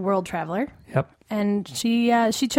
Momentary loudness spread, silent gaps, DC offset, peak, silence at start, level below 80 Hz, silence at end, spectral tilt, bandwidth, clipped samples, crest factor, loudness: 8 LU; none; under 0.1%; -4 dBFS; 0 s; -58 dBFS; 0 s; -5 dB/octave; 16.5 kHz; under 0.1%; 18 dB; -24 LUFS